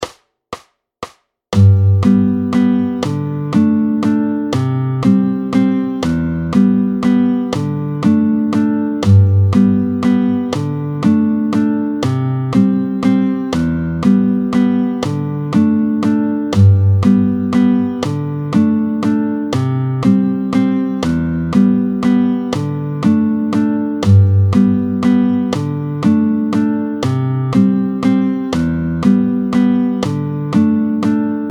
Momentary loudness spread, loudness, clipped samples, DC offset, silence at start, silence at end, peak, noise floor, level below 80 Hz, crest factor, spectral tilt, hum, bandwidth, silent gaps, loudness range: 7 LU; -14 LUFS; under 0.1%; under 0.1%; 0 s; 0 s; 0 dBFS; -34 dBFS; -42 dBFS; 14 dB; -8.5 dB/octave; none; 10 kHz; none; 2 LU